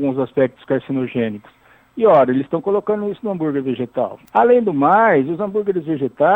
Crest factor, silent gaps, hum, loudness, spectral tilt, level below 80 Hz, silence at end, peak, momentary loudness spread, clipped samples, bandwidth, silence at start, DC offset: 16 dB; none; none; -18 LUFS; -9.5 dB/octave; -60 dBFS; 0 s; -2 dBFS; 10 LU; under 0.1%; 4.1 kHz; 0 s; under 0.1%